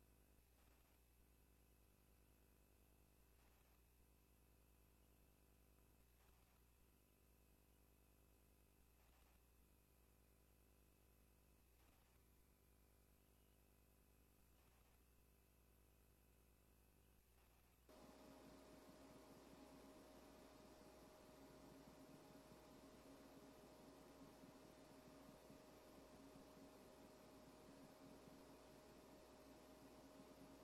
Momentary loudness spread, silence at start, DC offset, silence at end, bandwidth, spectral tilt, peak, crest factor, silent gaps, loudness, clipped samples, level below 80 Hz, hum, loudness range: 1 LU; 0 s; under 0.1%; 0 s; 13.5 kHz; -4.5 dB/octave; -52 dBFS; 18 dB; none; -66 LUFS; under 0.1%; -78 dBFS; none; 1 LU